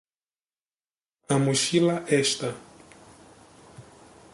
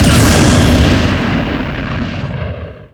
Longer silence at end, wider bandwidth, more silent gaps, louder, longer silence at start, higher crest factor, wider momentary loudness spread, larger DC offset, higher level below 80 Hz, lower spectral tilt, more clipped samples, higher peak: first, 0.5 s vs 0.1 s; second, 11.5 kHz vs over 20 kHz; neither; second, -24 LUFS vs -12 LUFS; first, 1.3 s vs 0 s; first, 20 dB vs 12 dB; second, 10 LU vs 13 LU; neither; second, -66 dBFS vs -22 dBFS; about the same, -4 dB/octave vs -5 dB/octave; neither; second, -10 dBFS vs 0 dBFS